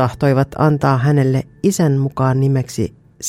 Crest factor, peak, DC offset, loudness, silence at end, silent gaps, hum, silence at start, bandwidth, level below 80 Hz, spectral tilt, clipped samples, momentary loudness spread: 14 dB; -2 dBFS; under 0.1%; -16 LUFS; 0 s; none; none; 0 s; 14.5 kHz; -46 dBFS; -7 dB/octave; under 0.1%; 6 LU